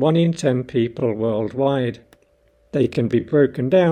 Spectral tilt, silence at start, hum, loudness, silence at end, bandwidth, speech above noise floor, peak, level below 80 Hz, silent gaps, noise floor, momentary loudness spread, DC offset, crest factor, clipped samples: -7.5 dB/octave; 0 s; none; -20 LUFS; 0 s; 9.4 kHz; 40 dB; -4 dBFS; -54 dBFS; none; -58 dBFS; 6 LU; under 0.1%; 16 dB; under 0.1%